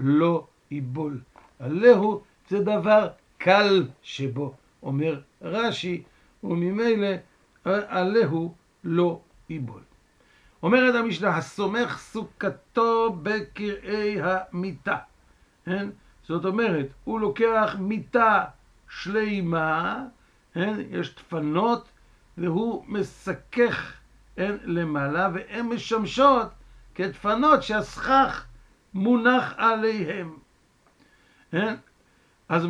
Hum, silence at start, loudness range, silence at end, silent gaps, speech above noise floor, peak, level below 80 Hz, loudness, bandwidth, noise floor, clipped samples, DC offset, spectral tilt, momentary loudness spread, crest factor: none; 0 s; 6 LU; 0 s; none; 38 dB; -4 dBFS; -56 dBFS; -25 LUFS; 10.5 kHz; -62 dBFS; under 0.1%; under 0.1%; -6.5 dB/octave; 16 LU; 22 dB